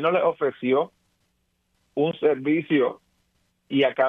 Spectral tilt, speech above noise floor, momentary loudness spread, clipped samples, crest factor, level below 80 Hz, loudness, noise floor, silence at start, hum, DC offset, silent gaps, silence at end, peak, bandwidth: -8.5 dB/octave; 49 dB; 6 LU; under 0.1%; 16 dB; -74 dBFS; -24 LUFS; -71 dBFS; 0 s; none; under 0.1%; none; 0 s; -8 dBFS; 4 kHz